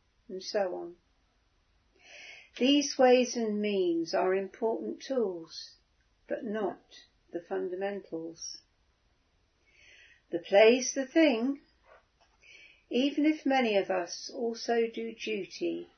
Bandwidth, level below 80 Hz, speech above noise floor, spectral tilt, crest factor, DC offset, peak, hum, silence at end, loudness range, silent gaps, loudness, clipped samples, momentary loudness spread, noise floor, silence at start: 6.6 kHz; -76 dBFS; 42 dB; -3.5 dB/octave; 22 dB; under 0.1%; -8 dBFS; none; 0.15 s; 10 LU; none; -30 LUFS; under 0.1%; 20 LU; -71 dBFS; 0.3 s